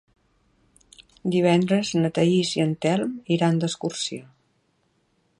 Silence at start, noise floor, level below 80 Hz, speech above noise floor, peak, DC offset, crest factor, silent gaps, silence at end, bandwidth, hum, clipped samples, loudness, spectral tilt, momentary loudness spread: 1 s; -68 dBFS; -64 dBFS; 46 dB; -6 dBFS; under 0.1%; 18 dB; none; 1.15 s; 11.5 kHz; none; under 0.1%; -23 LUFS; -5.5 dB/octave; 9 LU